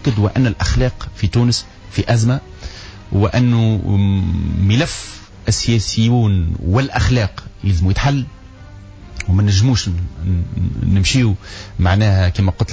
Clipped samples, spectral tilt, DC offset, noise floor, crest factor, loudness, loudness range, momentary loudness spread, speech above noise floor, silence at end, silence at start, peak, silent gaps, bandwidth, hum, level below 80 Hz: under 0.1%; -6 dB/octave; under 0.1%; -36 dBFS; 12 dB; -17 LUFS; 2 LU; 11 LU; 21 dB; 0 s; 0 s; -4 dBFS; none; 8 kHz; none; -26 dBFS